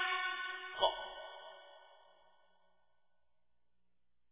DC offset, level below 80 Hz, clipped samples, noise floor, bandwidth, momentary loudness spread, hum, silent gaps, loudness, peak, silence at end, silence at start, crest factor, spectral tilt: under 0.1%; -74 dBFS; under 0.1%; -88 dBFS; 3.9 kHz; 20 LU; none; none; -38 LUFS; -18 dBFS; 2.35 s; 0 s; 26 dB; 3.5 dB/octave